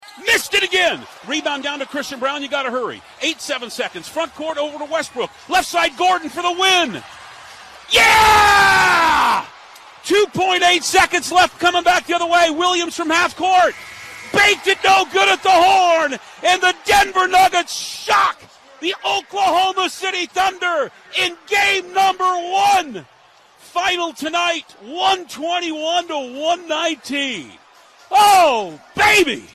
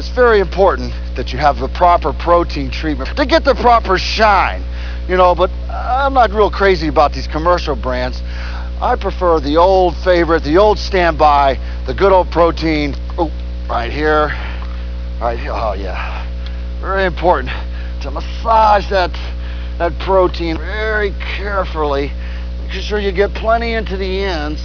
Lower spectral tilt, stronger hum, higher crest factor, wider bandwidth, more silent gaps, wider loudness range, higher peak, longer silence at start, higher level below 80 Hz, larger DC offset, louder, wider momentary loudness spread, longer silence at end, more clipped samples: second, -1.5 dB/octave vs -6.5 dB/octave; second, none vs 60 Hz at -20 dBFS; about the same, 16 dB vs 14 dB; first, 13 kHz vs 5.4 kHz; neither; about the same, 8 LU vs 6 LU; about the same, -2 dBFS vs 0 dBFS; about the same, 0.05 s vs 0 s; second, -48 dBFS vs -22 dBFS; second, under 0.1% vs 0.8%; about the same, -16 LUFS vs -15 LUFS; about the same, 12 LU vs 13 LU; about the same, 0.1 s vs 0 s; neither